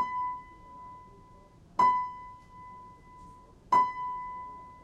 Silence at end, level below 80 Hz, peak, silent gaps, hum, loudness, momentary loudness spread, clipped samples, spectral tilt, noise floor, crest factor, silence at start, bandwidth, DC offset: 0.05 s; -60 dBFS; -14 dBFS; none; none; -30 LUFS; 26 LU; under 0.1%; -4.5 dB/octave; -55 dBFS; 20 dB; 0 s; 9.6 kHz; under 0.1%